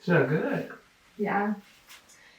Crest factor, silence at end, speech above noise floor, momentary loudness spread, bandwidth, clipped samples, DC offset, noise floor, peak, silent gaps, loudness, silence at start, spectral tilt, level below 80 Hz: 20 dB; 0.4 s; 27 dB; 21 LU; 16.5 kHz; under 0.1%; under 0.1%; -53 dBFS; -10 dBFS; none; -28 LUFS; 0.05 s; -7.5 dB/octave; -72 dBFS